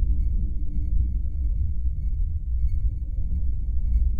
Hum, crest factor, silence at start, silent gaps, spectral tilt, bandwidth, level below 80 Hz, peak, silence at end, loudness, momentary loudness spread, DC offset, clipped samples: none; 12 dB; 0 s; none; -11.5 dB/octave; 0.7 kHz; -24 dBFS; -10 dBFS; 0 s; -29 LUFS; 3 LU; under 0.1%; under 0.1%